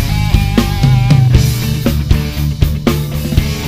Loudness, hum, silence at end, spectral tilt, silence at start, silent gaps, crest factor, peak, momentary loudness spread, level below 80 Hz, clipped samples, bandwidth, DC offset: -13 LUFS; none; 0 s; -6 dB/octave; 0 s; none; 12 dB; 0 dBFS; 6 LU; -18 dBFS; 0.9%; 16 kHz; 0.5%